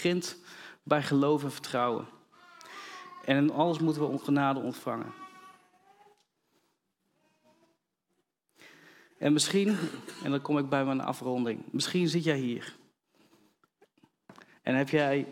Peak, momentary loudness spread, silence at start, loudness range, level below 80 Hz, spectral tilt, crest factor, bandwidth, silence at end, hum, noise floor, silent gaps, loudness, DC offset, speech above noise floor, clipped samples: -10 dBFS; 18 LU; 0 s; 5 LU; -80 dBFS; -5 dB/octave; 22 dB; 16.5 kHz; 0 s; none; -80 dBFS; none; -30 LUFS; under 0.1%; 51 dB; under 0.1%